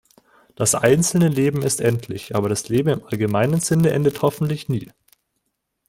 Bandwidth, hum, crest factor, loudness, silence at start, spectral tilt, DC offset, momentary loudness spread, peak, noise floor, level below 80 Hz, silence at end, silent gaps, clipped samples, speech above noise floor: 16.5 kHz; none; 18 dB; -20 LUFS; 0.6 s; -5.5 dB/octave; under 0.1%; 9 LU; -2 dBFS; -75 dBFS; -52 dBFS; 1.05 s; none; under 0.1%; 55 dB